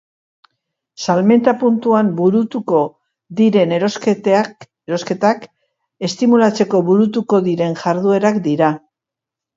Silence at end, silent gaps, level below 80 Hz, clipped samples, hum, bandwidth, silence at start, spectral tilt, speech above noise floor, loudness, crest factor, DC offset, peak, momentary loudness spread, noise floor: 0.8 s; none; -64 dBFS; under 0.1%; none; 7.8 kHz; 1 s; -6.5 dB/octave; 71 dB; -16 LUFS; 16 dB; under 0.1%; 0 dBFS; 11 LU; -85 dBFS